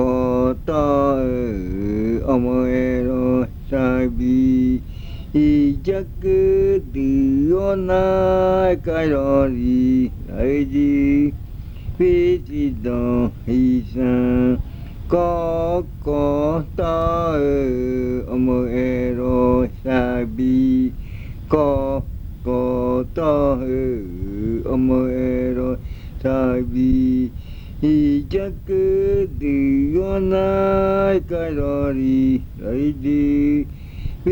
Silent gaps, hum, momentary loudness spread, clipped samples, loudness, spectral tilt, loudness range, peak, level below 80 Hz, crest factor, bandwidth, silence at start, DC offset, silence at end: none; none; 8 LU; under 0.1%; -19 LUFS; -9.5 dB/octave; 3 LU; -2 dBFS; -30 dBFS; 16 dB; 19 kHz; 0 s; under 0.1%; 0 s